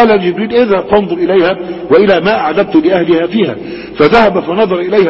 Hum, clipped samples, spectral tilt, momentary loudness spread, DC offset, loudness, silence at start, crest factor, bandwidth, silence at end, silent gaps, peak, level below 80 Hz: none; 0.3%; -8 dB/octave; 6 LU; under 0.1%; -10 LUFS; 0 s; 10 dB; 6.8 kHz; 0 s; none; 0 dBFS; -42 dBFS